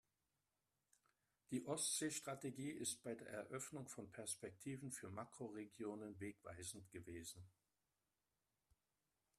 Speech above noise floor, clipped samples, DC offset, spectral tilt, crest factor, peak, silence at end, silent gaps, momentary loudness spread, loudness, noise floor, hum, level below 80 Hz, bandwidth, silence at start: over 40 dB; under 0.1%; under 0.1%; -3.5 dB/octave; 22 dB; -32 dBFS; 1.9 s; none; 11 LU; -49 LUFS; under -90 dBFS; none; -84 dBFS; 14 kHz; 1.5 s